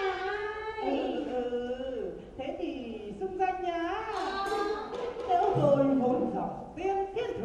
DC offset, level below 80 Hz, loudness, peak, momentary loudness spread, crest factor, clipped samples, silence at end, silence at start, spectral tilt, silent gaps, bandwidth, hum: under 0.1%; -56 dBFS; -31 LUFS; -12 dBFS; 12 LU; 18 dB; under 0.1%; 0 s; 0 s; -6.5 dB/octave; none; 11.5 kHz; none